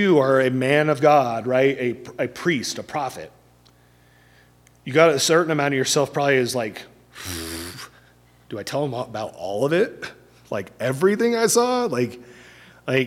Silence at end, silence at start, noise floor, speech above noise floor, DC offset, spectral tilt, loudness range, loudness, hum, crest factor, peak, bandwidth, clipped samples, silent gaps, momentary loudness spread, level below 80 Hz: 0 s; 0 s; -55 dBFS; 34 dB; under 0.1%; -4.5 dB/octave; 7 LU; -21 LUFS; 60 Hz at -55 dBFS; 22 dB; 0 dBFS; 16.5 kHz; under 0.1%; none; 19 LU; -58 dBFS